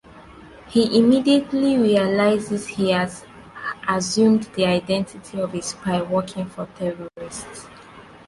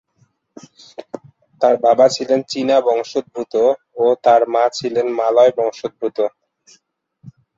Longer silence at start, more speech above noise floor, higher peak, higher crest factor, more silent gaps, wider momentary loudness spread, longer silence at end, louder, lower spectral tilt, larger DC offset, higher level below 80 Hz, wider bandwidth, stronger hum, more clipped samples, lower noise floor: second, 0.15 s vs 1 s; second, 24 dB vs 45 dB; about the same, -4 dBFS vs -2 dBFS; about the same, 16 dB vs 16 dB; neither; about the same, 16 LU vs 16 LU; about the same, 0.25 s vs 0.3 s; second, -21 LUFS vs -16 LUFS; about the same, -5 dB/octave vs -4.5 dB/octave; neither; first, -54 dBFS vs -66 dBFS; first, 11.5 kHz vs 8 kHz; neither; neither; second, -44 dBFS vs -61 dBFS